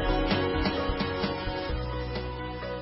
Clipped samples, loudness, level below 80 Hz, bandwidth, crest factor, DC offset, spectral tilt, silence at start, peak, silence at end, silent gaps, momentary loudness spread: under 0.1%; -30 LUFS; -36 dBFS; 5.8 kHz; 16 dB; under 0.1%; -10 dB/octave; 0 s; -12 dBFS; 0 s; none; 8 LU